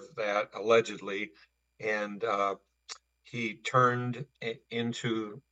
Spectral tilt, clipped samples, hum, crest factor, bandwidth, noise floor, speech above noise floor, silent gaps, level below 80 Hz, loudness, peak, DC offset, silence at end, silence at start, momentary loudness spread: -5 dB/octave; under 0.1%; none; 22 dB; 8.8 kHz; -51 dBFS; 19 dB; none; -78 dBFS; -31 LUFS; -10 dBFS; under 0.1%; 0.15 s; 0 s; 16 LU